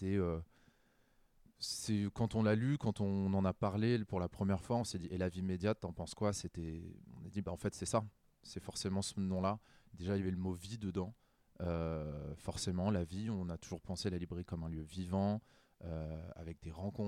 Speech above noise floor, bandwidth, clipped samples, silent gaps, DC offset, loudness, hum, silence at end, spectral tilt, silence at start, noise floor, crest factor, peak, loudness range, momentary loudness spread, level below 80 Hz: 34 dB; 14 kHz; under 0.1%; none; under 0.1%; -39 LUFS; none; 0 s; -6 dB/octave; 0 s; -72 dBFS; 18 dB; -20 dBFS; 5 LU; 11 LU; -60 dBFS